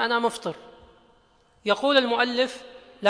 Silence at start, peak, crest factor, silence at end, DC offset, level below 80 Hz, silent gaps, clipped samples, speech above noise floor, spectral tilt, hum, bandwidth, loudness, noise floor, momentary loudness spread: 0 s; -6 dBFS; 20 dB; 0 s; under 0.1%; -66 dBFS; none; under 0.1%; 37 dB; -3.5 dB/octave; none; 10.5 kHz; -24 LUFS; -61 dBFS; 16 LU